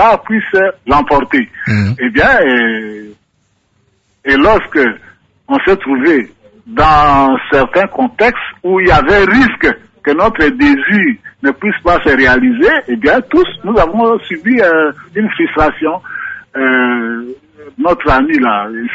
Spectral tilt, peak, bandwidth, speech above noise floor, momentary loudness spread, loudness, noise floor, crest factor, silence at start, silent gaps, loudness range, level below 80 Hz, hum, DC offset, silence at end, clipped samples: -7 dB/octave; 0 dBFS; 7.8 kHz; 48 dB; 9 LU; -11 LUFS; -59 dBFS; 12 dB; 0 s; none; 4 LU; -30 dBFS; none; under 0.1%; 0 s; under 0.1%